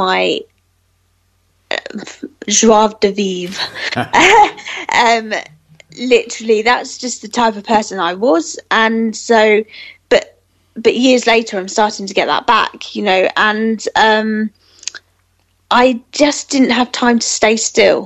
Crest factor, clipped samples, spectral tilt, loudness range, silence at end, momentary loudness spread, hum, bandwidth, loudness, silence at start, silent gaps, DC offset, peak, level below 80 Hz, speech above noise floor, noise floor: 14 dB; under 0.1%; -2.5 dB/octave; 3 LU; 0 s; 12 LU; none; 11.5 kHz; -13 LUFS; 0 s; none; under 0.1%; 0 dBFS; -50 dBFS; 45 dB; -59 dBFS